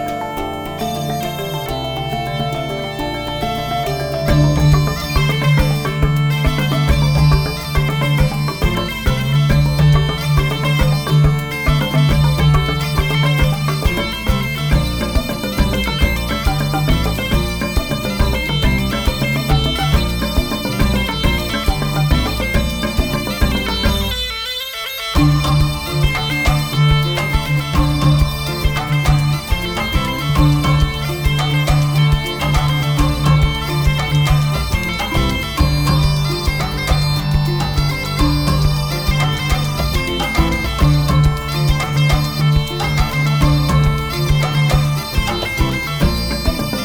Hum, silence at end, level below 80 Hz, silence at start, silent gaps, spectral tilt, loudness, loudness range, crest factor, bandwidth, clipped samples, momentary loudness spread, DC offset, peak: none; 0 s; -22 dBFS; 0 s; none; -5.5 dB/octave; -17 LUFS; 3 LU; 12 dB; over 20 kHz; under 0.1%; 6 LU; under 0.1%; -4 dBFS